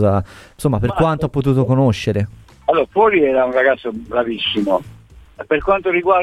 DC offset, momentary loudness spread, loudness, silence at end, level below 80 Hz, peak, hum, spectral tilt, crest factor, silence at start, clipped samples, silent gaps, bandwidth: under 0.1%; 8 LU; -17 LUFS; 0 s; -40 dBFS; -2 dBFS; none; -7 dB/octave; 14 dB; 0 s; under 0.1%; none; 13.5 kHz